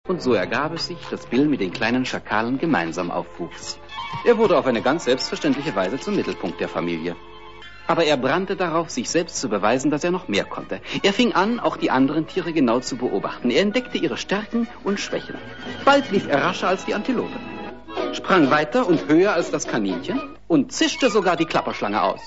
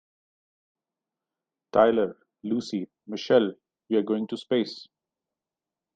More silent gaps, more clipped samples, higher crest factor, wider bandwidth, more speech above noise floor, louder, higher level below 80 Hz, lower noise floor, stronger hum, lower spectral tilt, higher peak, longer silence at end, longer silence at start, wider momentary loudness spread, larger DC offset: neither; neither; about the same, 18 dB vs 22 dB; second, 8 kHz vs 9 kHz; second, 20 dB vs 65 dB; first, -21 LUFS vs -26 LUFS; first, -52 dBFS vs -68 dBFS; second, -42 dBFS vs -90 dBFS; neither; second, -4.5 dB/octave vs -6 dB/octave; about the same, -4 dBFS vs -6 dBFS; second, 0 s vs 1.15 s; second, 0.05 s vs 1.75 s; about the same, 13 LU vs 14 LU; first, 0.6% vs under 0.1%